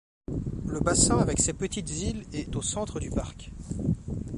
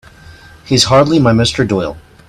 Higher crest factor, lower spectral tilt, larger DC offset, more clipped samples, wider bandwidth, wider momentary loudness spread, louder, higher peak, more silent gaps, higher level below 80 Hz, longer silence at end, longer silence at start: first, 20 dB vs 14 dB; about the same, -4.5 dB/octave vs -5 dB/octave; neither; neither; second, 11.5 kHz vs 15.5 kHz; first, 13 LU vs 8 LU; second, -28 LUFS vs -11 LUFS; second, -8 dBFS vs 0 dBFS; neither; about the same, -40 dBFS vs -38 dBFS; second, 0 s vs 0.3 s; about the same, 0.3 s vs 0.3 s